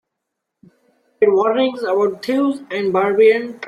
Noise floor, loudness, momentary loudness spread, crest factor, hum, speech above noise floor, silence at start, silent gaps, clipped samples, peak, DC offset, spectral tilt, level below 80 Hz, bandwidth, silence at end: -78 dBFS; -17 LUFS; 6 LU; 16 dB; none; 62 dB; 1.2 s; none; under 0.1%; -2 dBFS; under 0.1%; -6 dB/octave; -66 dBFS; 10.5 kHz; 0 s